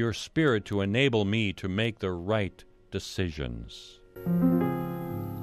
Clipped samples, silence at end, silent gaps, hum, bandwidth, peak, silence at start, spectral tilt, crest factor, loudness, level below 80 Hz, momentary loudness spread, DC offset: under 0.1%; 0 s; none; none; 14 kHz; -10 dBFS; 0 s; -6.5 dB/octave; 18 dB; -29 LUFS; -50 dBFS; 13 LU; under 0.1%